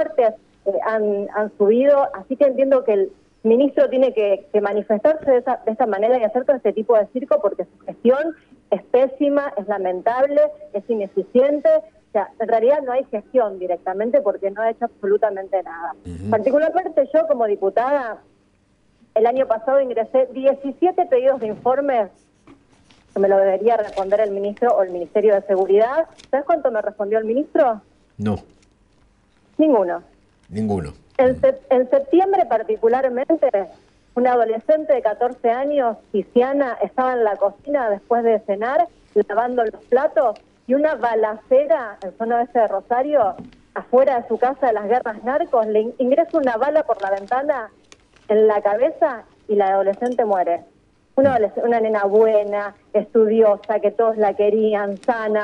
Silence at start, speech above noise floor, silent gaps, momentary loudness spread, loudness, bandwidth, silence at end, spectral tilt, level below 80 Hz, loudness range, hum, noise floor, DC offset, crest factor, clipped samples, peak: 0 s; 41 dB; none; 8 LU; -19 LUFS; 6.8 kHz; 0 s; -7.5 dB/octave; -58 dBFS; 3 LU; none; -59 dBFS; under 0.1%; 16 dB; under 0.1%; -4 dBFS